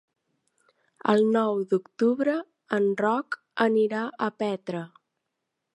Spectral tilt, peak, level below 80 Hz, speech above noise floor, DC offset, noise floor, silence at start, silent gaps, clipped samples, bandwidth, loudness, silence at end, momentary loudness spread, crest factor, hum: -7 dB/octave; -6 dBFS; -80 dBFS; 57 dB; under 0.1%; -82 dBFS; 1.05 s; none; under 0.1%; 11 kHz; -26 LUFS; 0.9 s; 10 LU; 20 dB; none